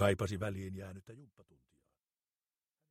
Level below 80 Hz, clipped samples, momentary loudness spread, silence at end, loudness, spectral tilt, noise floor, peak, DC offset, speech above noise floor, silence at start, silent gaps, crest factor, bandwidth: -66 dBFS; under 0.1%; 22 LU; 1.65 s; -39 LUFS; -6 dB/octave; under -90 dBFS; -18 dBFS; under 0.1%; over 52 dB; 0 s; none; 24 dB; 15.5 kHz